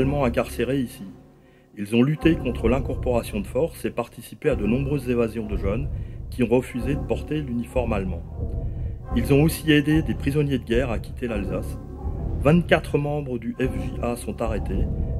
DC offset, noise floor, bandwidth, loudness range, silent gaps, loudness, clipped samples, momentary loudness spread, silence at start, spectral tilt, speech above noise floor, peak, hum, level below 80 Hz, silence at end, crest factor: under 0.1%; -52 dBFS; 14.5 kHz; 3 LU; none; -24 LUFS; under 0.1%; 12 LU; 0 s; -7 dB/octave; 29 dB; -2 dBFS; none; -32 dBFS; 0 s; 22 dB